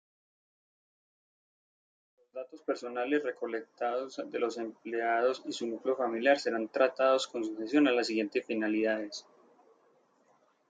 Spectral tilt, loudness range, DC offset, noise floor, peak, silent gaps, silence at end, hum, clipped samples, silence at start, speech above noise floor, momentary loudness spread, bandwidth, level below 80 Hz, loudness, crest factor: -4 dB/octave; 9 LU; under 0.1%; -69 dBFS; -14 dBFS; none; 1.5 s; none; under 0.1%; 2.35 s; 38 dB; 11 LU; 9.2 kHz; -86 dBFS; -31 LUFS; 20 dB